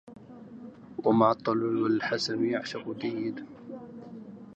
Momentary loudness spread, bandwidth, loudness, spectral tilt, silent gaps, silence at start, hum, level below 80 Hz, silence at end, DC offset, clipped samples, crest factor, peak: 23 LU; 8.2 kHz; -28 LUFS; -6 dB/octave; none; 0.05 s; none; -72 dBFS; 0 s; under 0.1%; under 0.1%; 20 dB; -10 dBFS